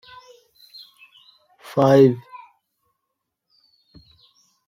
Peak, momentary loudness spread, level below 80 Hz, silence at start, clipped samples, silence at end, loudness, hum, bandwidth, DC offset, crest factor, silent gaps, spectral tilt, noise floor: -2 dBFS; 29 LU; -64 dBFS; 1.75 s; under 0.1%; 2.5 s; -17 LUFS; none; 15.5 kHz; under 0.1%; 22 dB; none; -8 dB/octave; -80 dBFS